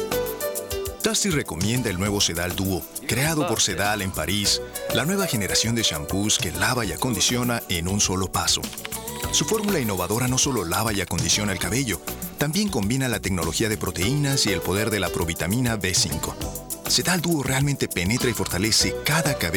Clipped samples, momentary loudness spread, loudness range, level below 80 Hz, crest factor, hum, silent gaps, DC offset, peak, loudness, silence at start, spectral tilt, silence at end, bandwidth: under 0.1%; 6 LU; 2 LU; -42 dBFS; 16 dB; none; none; under 0.1%; -8 dBFS; -23 LUFS; 0 s; -3.5 dB/octave; 0 s; over 20 kHz